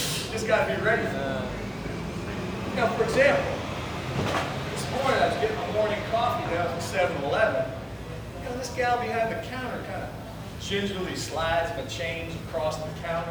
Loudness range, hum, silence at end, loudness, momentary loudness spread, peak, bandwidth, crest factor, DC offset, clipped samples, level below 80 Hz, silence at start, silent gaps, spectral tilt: 4 LU; none; 0 s; -28 LUFS; 10 LU; -8 dBFS; over 20 kHz; 20 dB; under 0.1%; under 0.1%; -46 dBFS; 0 s; none; -4.5 dB/octave